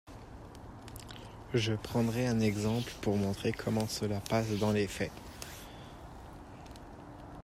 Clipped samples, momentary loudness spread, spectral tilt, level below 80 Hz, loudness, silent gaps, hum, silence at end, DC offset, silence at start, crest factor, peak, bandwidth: under 0.1%; 19 LU; -6 dB/octave; -54 dBFS; -33 LUFS; none; none; 0 s; under 0.1%; 0.05 s; 18 dB; -16 dBFS; 16 kHz